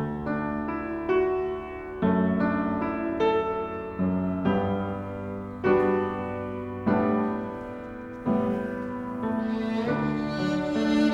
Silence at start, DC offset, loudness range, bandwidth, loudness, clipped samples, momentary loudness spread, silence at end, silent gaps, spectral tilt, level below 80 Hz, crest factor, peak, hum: 0 s; under 0.1%; 2 LU; 8 kHz; -27 LUFS; under 0.1%; 10 LU; 0 s; none; -8 dB/octave; -50 dBFS; 16 dB; -10 dBFS; none